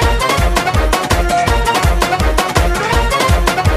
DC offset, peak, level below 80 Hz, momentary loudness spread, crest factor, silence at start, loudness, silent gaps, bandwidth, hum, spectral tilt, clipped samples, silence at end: under 0.1%; 0 dBFS; -16 dBFS; 1 LU; 12 dB; 0 s; -14 LUFS; none; 15.5 kHz; none; -4.5 dB/octave; under 0.1%; 0 s